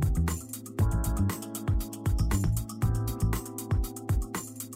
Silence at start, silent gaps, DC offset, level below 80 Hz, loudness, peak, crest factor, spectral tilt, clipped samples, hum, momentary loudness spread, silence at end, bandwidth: 0 s; none; under 0.1%; -34 dBFS; -31 LUFS; -14 dBFS; 14 dB; -6 dB/octave; under 0.1%; none; 6 LU; 0 s; 16 kHz